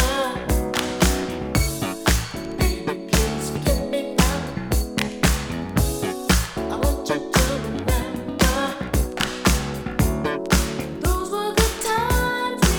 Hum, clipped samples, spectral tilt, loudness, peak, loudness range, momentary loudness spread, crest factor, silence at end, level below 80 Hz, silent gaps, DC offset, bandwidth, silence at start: none; under 0.1%; -4.5 dB/octave; -22 LUFS; -2 dBFS; 1 LU; 5 LU; 20 dB; 0 s; -26 dBFS; none; under 0.1%; over 20 kHz; 0 s